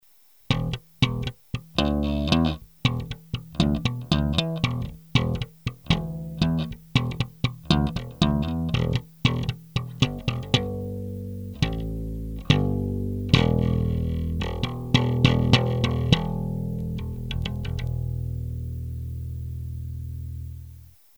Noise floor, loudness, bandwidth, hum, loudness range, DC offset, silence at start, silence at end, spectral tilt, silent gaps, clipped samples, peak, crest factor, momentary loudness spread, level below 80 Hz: -58 dBFS; -26 LUFS; over 20 kHz; none; 7 LU; 0.1%; 0.5 s; 0.25 s; -6.5 dB/octave; none; under 0.1%; 0 dBFS; 24 dB; 12 LU; -36 dBFS